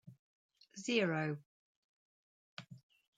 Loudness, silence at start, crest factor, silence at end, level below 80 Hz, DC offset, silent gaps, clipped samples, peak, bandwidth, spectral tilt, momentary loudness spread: -37 LUFS; 0.05 s; 24 dB; 0.4 s; -88 dBFS; under 0.1%; 0.19-0.49 s, 1.46-2.57 s; under 0.1%; -20 dBFS; 9.4 kHz; -5 dB/octave; 22 LU